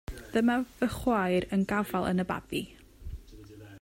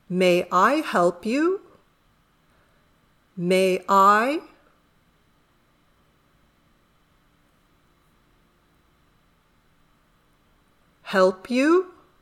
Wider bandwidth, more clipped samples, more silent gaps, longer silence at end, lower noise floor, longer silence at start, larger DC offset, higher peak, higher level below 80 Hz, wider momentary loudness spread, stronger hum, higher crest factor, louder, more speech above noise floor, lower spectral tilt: about the same, 16 kHz vs 15.5 kHz; neither; neither; second, 0 s vs 0.35 s; second, -49 dBFS vs -63 dBFS; about the same, 0.1 s vs 0.1 s; neither; second, -14 dBFS vs -4 dBFS; first, -48 dBFS vs -68 dBFS; first, 20 LU vs 14 LU; neither; about the same, 16 dB vs 20 dB; second, -30 LUFS vs -21 LUFS; second, 20 dB vs 43 dB; about the same, -6.5 dB/octave vs -5.5 dB/octave